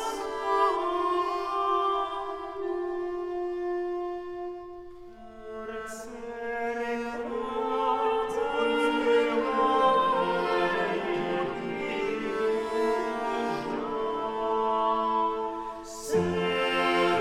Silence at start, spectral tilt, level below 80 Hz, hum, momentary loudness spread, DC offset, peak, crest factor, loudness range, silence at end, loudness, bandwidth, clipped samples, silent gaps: 0 s; -5 dB/octave; -56 dBFS; none; 13 LU; under 0.1%; -12 dBFS; 16 dB; 10 LU; 0 s; -28 LUFS; 14.5 kHz; under 0.1%; none